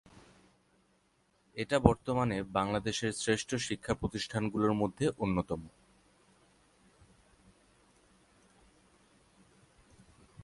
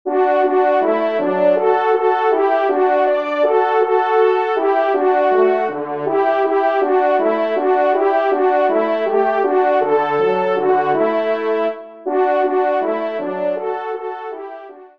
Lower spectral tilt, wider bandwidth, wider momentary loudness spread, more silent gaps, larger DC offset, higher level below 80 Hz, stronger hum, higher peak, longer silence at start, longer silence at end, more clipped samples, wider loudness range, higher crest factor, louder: second, -5.5 dB/octave vs -7 dB/octave; first, 11.5 kHz vs 5.6 kHz; first, 10 LU vs 7 LU; neither; second, under 0.1% vs 0.3%; first, -52 dBFS vs -72 dBFS; neither; about the same, -4 dBFS vs -2 dBFS; first, 1.55 s vs 0.05 s; about the same, 0 s vs 0.1 s; neither; first, 8 LU vs 3 LU; first, 32 dB vs 14 dB; second, -33 LUFS vs -16 LUFS